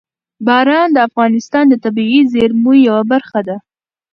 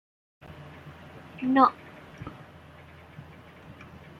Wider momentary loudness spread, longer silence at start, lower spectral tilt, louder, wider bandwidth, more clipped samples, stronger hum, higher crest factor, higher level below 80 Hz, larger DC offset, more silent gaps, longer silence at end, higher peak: second, 10 LU vs 28 LU; second, 0.4 s vs 0.6 s; second, -6 dB/octave vs -7.5 dB/octave; first, -12 LUFS vs -24 LUFS; about the same, 6.8 kHz vs 6.4 kHz; neither; neither; second, 12 dB vs 26 dB; first, -54 dBFS vs -62 dBFS; neither; neither; about the same, 0.55 s vs 0.5 s; first, 0 dBFS vs -6 dBFS